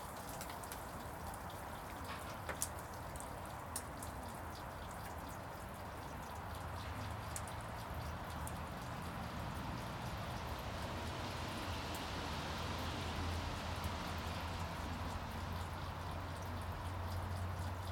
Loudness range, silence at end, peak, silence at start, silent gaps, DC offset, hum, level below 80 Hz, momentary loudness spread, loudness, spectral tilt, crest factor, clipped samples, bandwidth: 4 LU; 0 s; -14 dBFS; 0 s; none; under 0.1%; none; -54 dBFS; 5 LU; -45 LUFS; -4.5 dB/octave; 30 dB; under 0.1%; 18 kHz